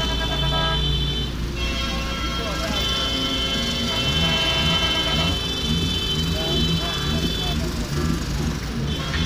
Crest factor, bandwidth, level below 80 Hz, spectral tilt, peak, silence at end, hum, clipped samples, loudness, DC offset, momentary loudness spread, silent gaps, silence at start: 14 dB; 16 kHz; -30 dBFS; -4 dB/octave; -8 dBFS; 0 s; none; under 0.1%; -22 LUFS; under 0.1%; 7 LU; none; 0 s